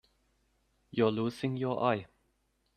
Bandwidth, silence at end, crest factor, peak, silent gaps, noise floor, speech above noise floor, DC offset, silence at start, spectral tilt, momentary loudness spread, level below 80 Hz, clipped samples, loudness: 13.5 kHz; 0.7 s; 20 dB; -14 dBFS; none; -75 dBFS; 45 dB; under 0.1%; 0.95 s; -7.5 dB/octave; 6 LU; -70 dBFS; under 0.1%; -32 LUFS